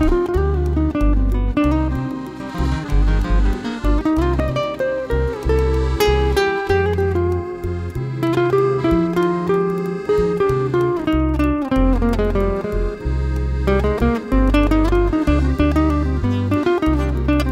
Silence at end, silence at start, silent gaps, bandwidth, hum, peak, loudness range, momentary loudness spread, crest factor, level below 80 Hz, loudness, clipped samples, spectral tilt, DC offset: 0 s; 0 s; none; 15 kHz; none; -2 dBFS; 2 LU; 6 LU; 14 dB; -22 dBFS; -19 LUFS; under 0.1%; -7.5 dB/octave; under 0.1%